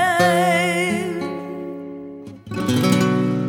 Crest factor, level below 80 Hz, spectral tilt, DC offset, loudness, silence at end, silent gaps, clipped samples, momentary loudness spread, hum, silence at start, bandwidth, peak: 18 dB; -60 dBFS; -5.5 dB/octave; under 0.1%; -19 LUFS; 0 s; none; under 0.1%; 18 LU; none; 0 s; 18 kHz; -2 dBFS